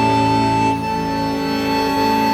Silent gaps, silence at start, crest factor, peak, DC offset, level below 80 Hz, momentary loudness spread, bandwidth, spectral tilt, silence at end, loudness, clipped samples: none; 0 s; 12 dB; -4 dBFS; under 0.1%; -40 dBFS; 5 LU; 17 kHz; -5.5 dB/octave; 0 s; -18 LUFS; under 0.1%